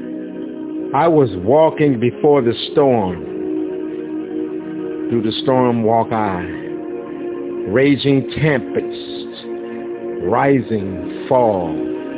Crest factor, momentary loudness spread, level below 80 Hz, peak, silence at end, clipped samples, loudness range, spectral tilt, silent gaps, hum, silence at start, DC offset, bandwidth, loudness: 16 dB; 13 LU; -48 dBFS; -2 dBFS; 0 s; under 0.1%; 4 LU; -11 dB/octave; none; none; 0 s; under 0.1%; 4 kHz; -18 LUFS